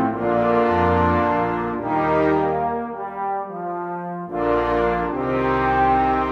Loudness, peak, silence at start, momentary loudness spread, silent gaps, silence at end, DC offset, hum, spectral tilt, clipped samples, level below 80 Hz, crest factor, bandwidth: -21 LUFS; -6 dBFS; 0 s; 10 LU; none; 0 s; under 0.1%; none; -8.5 dB/octave; under 0.1%; -40 dBFS; 14 dB; 7.4 kHz